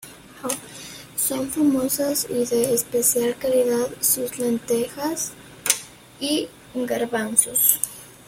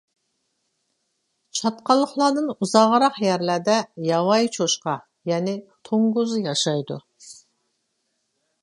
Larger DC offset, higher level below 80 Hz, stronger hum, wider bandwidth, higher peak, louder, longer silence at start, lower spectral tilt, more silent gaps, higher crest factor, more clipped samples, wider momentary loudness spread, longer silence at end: neither; first, -58 dBFS vs -76 dBFS; neither; first, 16.5 kHz vs 11.5 kHz; about the same, 0 dBFS vs -2 dBFS; about the same, -22 LUFS vs -21 LUFS; second, 0 s vs 1.55 s; second, -2.5 dB/octave vs -4.5 dB/octave; neither; about the same, 24 dB vs 22 dB; neither; about the same, 12 LU vs 11 LU; second, 0.15 s vs 1.3 s